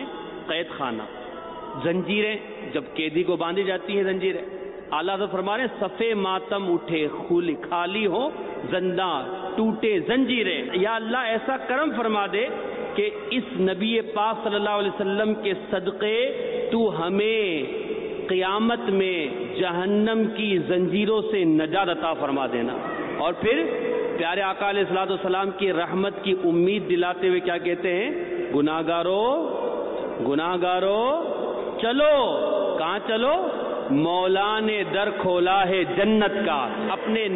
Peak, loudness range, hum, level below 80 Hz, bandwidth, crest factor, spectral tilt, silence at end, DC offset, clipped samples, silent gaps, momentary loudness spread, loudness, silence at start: -12 dBFS; 3 LU; none; -60 dBFS; 4.1 kHz; 12 dB; -10 dB/octave; 0 s; under 0.1%; under 0.1%; none; 7 LU; -24 LUFS; 0 s